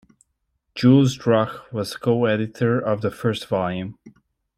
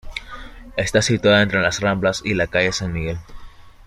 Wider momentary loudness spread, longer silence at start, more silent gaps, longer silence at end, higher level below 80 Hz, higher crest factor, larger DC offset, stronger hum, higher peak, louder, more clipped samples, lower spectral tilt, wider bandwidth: second, 13 LU vs 17 LU; first, 0.75 s vs 0.05 s; neither; first, 0.5 s vs 0.05 s; second, -58 dBFS vs -40 dBFS; about the same, 18 dB vs 18 dB; neither; neither; about the same, -4 dBFS vs -2 dBFS; about the same, -21 LUFS vs -19 LUFS; neither; first, -7 dB/octave vs -4.5 dB/octave; about the same, 15 kHz vs 14.5 kHz